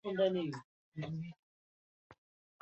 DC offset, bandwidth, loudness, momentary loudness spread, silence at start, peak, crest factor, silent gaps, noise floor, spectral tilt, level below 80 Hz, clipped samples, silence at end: under 0.1%; 8 kHz; -39 LUFS; 16 LU; 0.05 s; -20 dBFS; 20 dB; 0.64-0.92 s, 1.39-2.10 s; under -90 dBFS; -6 dB/octave; -76 dBFS; under 0.1%; 0.5 s